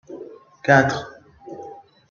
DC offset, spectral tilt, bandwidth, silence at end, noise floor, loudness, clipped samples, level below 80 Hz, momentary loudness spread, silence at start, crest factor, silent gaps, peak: under 0.1%; -6 dB/octave; 7.4 kHz; 0.35 s; -41 dBFS; -19 LUFS; under 0.1%; -58 dBFS; 24 LU; 0.1 s; 22 dB; none; -2 dBFS